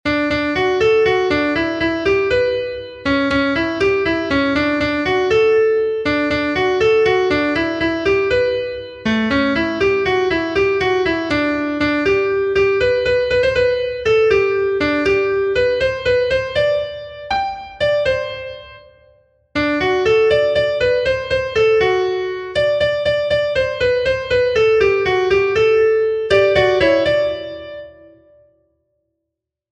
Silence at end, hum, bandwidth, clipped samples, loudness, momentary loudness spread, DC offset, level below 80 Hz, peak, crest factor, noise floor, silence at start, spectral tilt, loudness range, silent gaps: 1.8 s; none; 9 kHz; under 0.1%; -16 LUFS; 7 LU; under 0.1%; -40 dBFS; 0 dBFS; 16 dB; -80 dBFS; 0.05 s; -5.5 dB/octave; 3 LU; none